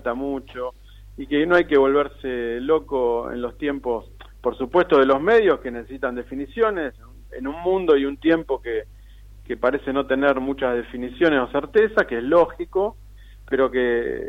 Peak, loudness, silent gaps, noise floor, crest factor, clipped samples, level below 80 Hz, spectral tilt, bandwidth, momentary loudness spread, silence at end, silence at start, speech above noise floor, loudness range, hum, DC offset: -6 dBFS; -21 LUFS; none; -44 dBFS; 16 dB; under 0.1%; -44 dBFS; -7 dB/octave; 6.8 kHz; 13 LU; 0 s; 0 s; 23 dB; 3 LU; none; under 0.1%